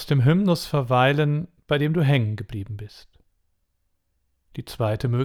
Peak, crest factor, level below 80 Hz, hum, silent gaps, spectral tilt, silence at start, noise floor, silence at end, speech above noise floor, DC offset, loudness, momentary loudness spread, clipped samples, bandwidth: -6 dBFS; 18 dB; -50 dBFS; none; none; -7 dB/octave; 0 s; -71 dBFS; 0 s; 50 dB; under 0.1%; -22 LUFS; 18 LU; under 0.1%; 14.5 kHz